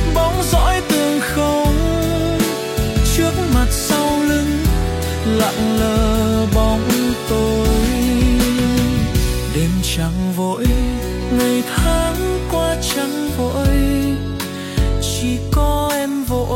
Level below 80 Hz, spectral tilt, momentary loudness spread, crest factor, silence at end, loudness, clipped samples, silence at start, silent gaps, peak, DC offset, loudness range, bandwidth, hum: -22 dBFS; -5 dB/octave; 4 LU; 12 dB; 0 s; -17 LUFS; under 0.1%; 0 s; none; -4 dBFS; under 0.1%; 2 LU; 16.5 kHz; none